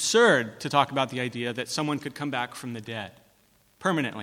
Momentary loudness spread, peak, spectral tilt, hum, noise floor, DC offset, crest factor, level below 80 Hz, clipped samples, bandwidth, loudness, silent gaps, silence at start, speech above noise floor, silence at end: 15 LU; -6 dBFS; -3.5 dB/octave; none; -63 dBFS; under 0.1%; 22 dB; -70 dBFS; under 0.1%; 16.5 kHz; -27 LUFS; none; 0 s; 37 dB; 0 s